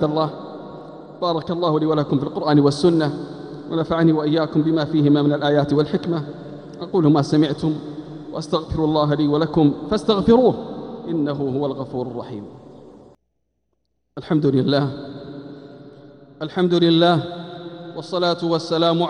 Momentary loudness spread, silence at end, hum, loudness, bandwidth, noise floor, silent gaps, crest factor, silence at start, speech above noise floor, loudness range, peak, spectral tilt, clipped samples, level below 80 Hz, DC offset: 18 LU; 0 s; none; -19 LUFS; 10 kHz; -73 dBFS; none; 16 dB; 0 s; 54 dB; 6 LU; -4 dBFS; -7.5 dB/octave; under 0.1%; -50 dBFS; under 0.1%